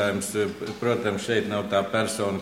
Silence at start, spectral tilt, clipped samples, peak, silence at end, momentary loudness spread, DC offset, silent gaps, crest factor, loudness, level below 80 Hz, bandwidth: 0 s; -4.5 dB/octave; under 0.1%; -8 dBFS; 0 s; 3 LU; under 0.1%; none; 16 dB; -26 LUFS; -62 dBFS; 16.5 kHz